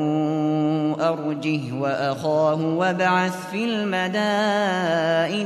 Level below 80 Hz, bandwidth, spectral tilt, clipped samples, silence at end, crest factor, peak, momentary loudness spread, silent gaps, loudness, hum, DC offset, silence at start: -68 dBFS; 13 kHz; -6 dB/octave; under 0.1%; 0 s; 14 dB; -8 dBFS; 5 LU; none; -22 LUFS; none; under 0.1%; 0 s